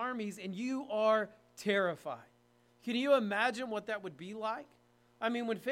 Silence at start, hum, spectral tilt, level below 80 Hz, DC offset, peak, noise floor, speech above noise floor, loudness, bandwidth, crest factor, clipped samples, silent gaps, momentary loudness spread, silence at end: 0 s; 60 Hz at -65 dBFS; -5 dB/octave; -82 dBFS; under 0.1%; -16 dBFS; -68 dBFS; 34 dB; -35 LUFS; 16 kHz; 20 dB; under 0.1%; none; 14 LU; 0 s